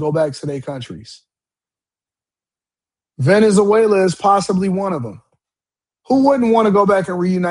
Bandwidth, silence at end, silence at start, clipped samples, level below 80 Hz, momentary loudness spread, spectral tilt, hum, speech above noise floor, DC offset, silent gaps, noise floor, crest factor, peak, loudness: 11 kHz; 0 s; 0 s; under 0.1%; -56 dBFS; 15 LU; -6.5 dB/octave; none; over 75 dB; under 0.1%; none; under -90 dBFS; 16 dB; 0 dBFS; -15 LUFS